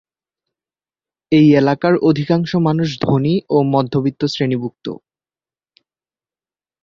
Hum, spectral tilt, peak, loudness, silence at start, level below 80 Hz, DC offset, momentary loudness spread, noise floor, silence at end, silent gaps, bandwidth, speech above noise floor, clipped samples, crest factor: none; -8 dB/octave; -2 dBFS; -16 LUFS; 1.3 s; -54 dBFS; under 0.1%; 11 LU; under -90 dBFS; 1.9 s; none; 7.4 kHz; over 75 dB; under 0.1%; 16 dB